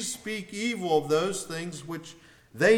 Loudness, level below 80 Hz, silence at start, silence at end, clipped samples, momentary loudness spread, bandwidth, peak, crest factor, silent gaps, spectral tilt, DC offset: -29 LUFS; -66 dBFS; 0 s; 0 s; under 0.1%; 14 LU; 17.5 kHz; -8 dBFS; 18 dB; none; -4 dB/octave; under 0.1%